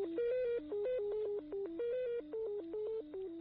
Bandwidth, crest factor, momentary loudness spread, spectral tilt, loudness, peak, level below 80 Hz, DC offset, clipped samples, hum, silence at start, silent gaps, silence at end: 4.6 kHz; 8 dB; 6 LU; -5 dB/octave; -40 LUFS; -30 dBFS; -70 dBFS; under 0.1%; under 0.1%; 50 Hz at -75 dBFS; 0 s; none; 0 s